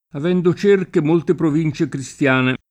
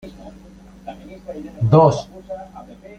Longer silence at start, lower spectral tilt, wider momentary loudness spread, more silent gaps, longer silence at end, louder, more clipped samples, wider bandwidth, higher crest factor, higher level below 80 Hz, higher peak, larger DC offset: about the same, 0.15 s vs 0.05 s; second, -7 dB/octave vs -8.5 dB/octave; second, 5 LU vs 26 LU; neither; about the same, 0.15 s vs 0.25 s; about the same, -18 LUFS vs -16 LUFS; neither; first, 9.8 kHz vs 8.4 kHz; second, 14 dB vs 20 dB; second, -54 dBFS vs -48 dBFS; about the same, -4 dBFS vs -2 dBFS; neither